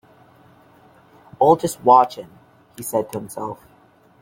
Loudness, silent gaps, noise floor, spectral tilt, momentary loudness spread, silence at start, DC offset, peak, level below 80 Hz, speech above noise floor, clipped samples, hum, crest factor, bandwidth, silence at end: -18 LUFS; none; -53 dBFS; -5.5 dB/octave; 19 LU; 1.4 s; under 0.1%; -2 dBFS; -62 dBFS; 35 dB; under 0.1%; none; 20 dB; 17 kHz; 0.7 s